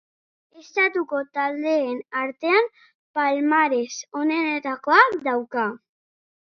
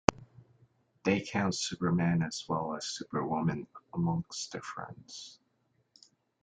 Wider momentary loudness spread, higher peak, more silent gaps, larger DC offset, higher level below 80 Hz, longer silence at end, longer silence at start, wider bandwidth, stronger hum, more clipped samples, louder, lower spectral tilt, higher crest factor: second, 10 LU vs 14 LU; about the same, -2 dBFS vs -2 dBFS; first, 2.95-3.14 s vs none; neither; second, -78 dBFS vs -60 dBFS; second, 0.7 s vs 1.1 s; first, 0.55 s vs 0.1 s; second, 7 kHz vs 9.4 kHz; neither; neither; first, -22 LUFS vs -33 LUFS; second, -3 dB/octave vs -5 dB/octave; second, 22 dB vs 32 dB